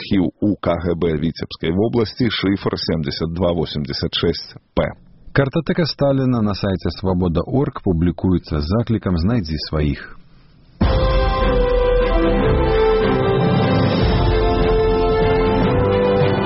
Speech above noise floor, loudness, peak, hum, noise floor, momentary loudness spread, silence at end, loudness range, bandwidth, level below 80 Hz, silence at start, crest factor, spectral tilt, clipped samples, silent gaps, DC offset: 28 dB; -18 LUFS; 0 dBFS; none; -47 dBFS; 6 LU; 0 s; 4 LU; 6 kHz; -26 dBFS; 0 s; 16 dB; -6 dB/octave; under 0.1%; none; under 0.1%